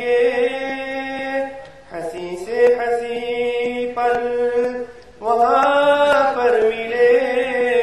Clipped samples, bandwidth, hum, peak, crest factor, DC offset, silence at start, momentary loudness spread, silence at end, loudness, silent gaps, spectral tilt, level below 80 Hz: under 0.1%; 11.5 kHz; none; -4 dBFS; 14 dB; 0.3%; 0 s; 14 LU; 0 s; -18 LUFS; none; -4 dB/octave; -54 dBFS